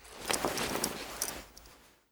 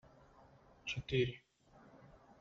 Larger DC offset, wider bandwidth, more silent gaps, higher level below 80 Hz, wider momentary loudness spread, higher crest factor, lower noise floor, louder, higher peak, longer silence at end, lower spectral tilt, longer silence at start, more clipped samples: neither; first, over 20 kHz vs 7.4 kHz; neither; first, -58 dBFS vs -64 dBFS; second, 17 LU vs 26 LU; first, 28 dB vs 22 dB; second, -58 dBFS vs -65 dBFS; first, -34 LUFS vs -39 LUFS; first, -10 dBFS vs -22 dBFS; second, 0.25 s vs 0.45 s; second, -2 dB/octave vs -5 dB/octave; second, 0 s vs 0.85 s; neither